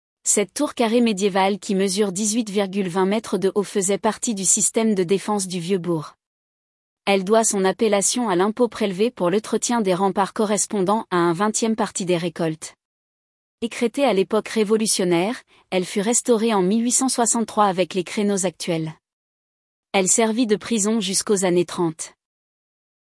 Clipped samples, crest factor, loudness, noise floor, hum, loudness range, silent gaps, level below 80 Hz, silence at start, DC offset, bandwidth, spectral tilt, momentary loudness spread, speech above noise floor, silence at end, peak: under 0.1%; 16 dB; -20 LUFS; under -90 dBFS; none; 3 LU; 6.27-6.97 s, 12.85-13.58 s, 19.13-19.83 s; -66 dBFS; 0.25 s; under 0.1%; 12 kHz; -3.5 dB/octave; 8 LU; over 70 dB; 0.95 s; -4 dBFS